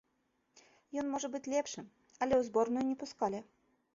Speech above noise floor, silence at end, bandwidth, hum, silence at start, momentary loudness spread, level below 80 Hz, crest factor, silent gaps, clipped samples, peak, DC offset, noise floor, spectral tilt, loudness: 44 dB; 0.5 s; 7.6 kHz; none; 0.95 s; 13 LU; -70 dBFS; 18 dB; none; under 0.1%; -20 dBFS; under 0.1%; -79 dBFS; -4 dB/octave; -36 LUFS